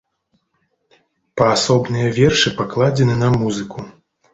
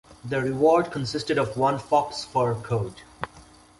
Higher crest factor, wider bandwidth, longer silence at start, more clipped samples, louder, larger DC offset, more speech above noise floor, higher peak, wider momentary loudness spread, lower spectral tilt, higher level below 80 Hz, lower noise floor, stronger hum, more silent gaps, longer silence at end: about the same, 18 dB vs 18 dB; second, 8 kHz vs 11.5 kHz; first, 1.35 s vs 0.1 s; neither; first, -16 LUFS vs -24 LUFS; neither; first, 52 dB vs 27 dB; first, -2 dBFS vs -8 dBFS; about the same, 17 LU vs 17 LU; about the same, -5 dB/octave vs -6 dB/octave; first, -46 dBFS vs -54 dBFS; first, -68 dBFS vs -51 dBFS; neither; neither; about the same, 0.45 s vs 0.4 s